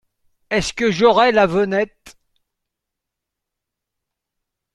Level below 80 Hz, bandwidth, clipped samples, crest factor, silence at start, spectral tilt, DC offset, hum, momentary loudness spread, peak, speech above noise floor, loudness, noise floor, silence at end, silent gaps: -48 dBFS; 12 kHz; under 0.1%; 20 dB; 0.5 s; -4.5 dB/octave; under 0.1%; none; 9 LU; -2 dBFS; 66 dB; -17 LUFS; -82 dBFS; 2.65 s; none